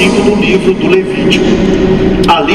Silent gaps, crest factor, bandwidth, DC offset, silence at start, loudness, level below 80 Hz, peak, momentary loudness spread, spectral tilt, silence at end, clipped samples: none; 8 dB; 12.5 kHz; under 0.1%; 0 s; -9 LUFS; -26 dBFS; 0 dBFS; 2 LU; -6 dB/octave; 0 s; 0.6%